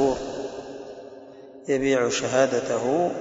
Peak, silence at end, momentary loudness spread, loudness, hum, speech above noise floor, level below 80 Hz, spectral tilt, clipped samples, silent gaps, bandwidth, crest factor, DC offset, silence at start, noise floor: -8 dBFS; 0 s; 20 LU; -24 LUFS; none; 21 dB; -56 dBFS; -4 dB/octave; under 0.1%; none; 8 kHz; 18 dB; under 0.1%; 0 s; -44 dBFS